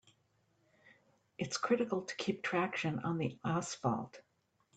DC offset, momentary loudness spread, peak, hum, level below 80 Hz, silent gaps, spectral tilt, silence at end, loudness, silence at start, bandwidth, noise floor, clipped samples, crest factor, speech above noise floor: under 0.1%; 7 LU; -20 dBFS; none; -76 dBFS; none; -5 dB/octave; 0.55 s; -36 LUFS; 0.85 s; 9 kHz; -75 dBFS; under 0.1%; 20 dB; 39 dB